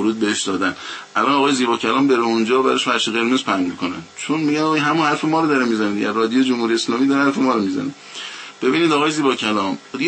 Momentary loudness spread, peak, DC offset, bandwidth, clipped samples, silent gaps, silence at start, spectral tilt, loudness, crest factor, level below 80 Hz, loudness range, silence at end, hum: 9 LU; -2 dBFS; under 0.1%; 8.8 kHz; under 0.1%; none; 0 s; -4 dB/octave; -18 LUFS; 16 dB; -66 dBFS; 1 LU; 0 s; none